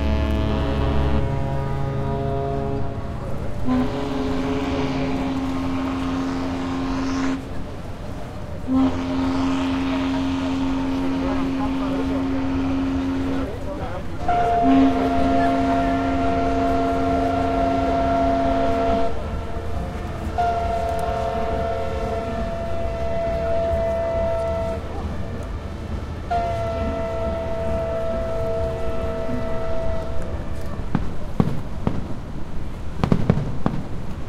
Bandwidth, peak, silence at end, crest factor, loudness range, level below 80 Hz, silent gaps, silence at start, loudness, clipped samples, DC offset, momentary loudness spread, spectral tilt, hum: 12 kHz; 0 dBFS; 0 s; 22 dB; 6 LU; -32 dBFS; none; 0 s; -24 LUFS; under 0.1%; under 0.1%; 10 LU; -7.5 dB/octave; none